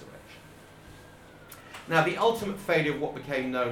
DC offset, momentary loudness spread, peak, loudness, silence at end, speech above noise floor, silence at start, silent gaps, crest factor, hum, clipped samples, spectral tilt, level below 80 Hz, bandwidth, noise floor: under 0.1%; 24 LU; -10 dBFS; -27 LUFS; 0 s; 23 dB; 0 s; none; 22 dB; none; under 0.1%; -5.5 dB/octave; -60 dBFS; 18.5 kHz; -50 dBFS